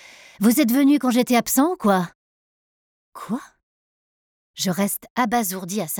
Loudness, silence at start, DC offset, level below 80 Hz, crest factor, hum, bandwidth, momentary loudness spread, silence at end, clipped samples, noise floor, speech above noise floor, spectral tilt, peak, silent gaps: -20 LUFS; 0.4 s; under 0.1%; -62 dBFS; 16 dB; none; 19 kHz; 13 LU; 0 s; under 0.1%; under -90 dBFS; over 70 dB; -4.5 dB/octave; -6 dBFS; 2.15-3.12 s, 3.63-4.54 s, 5.10-5.16 s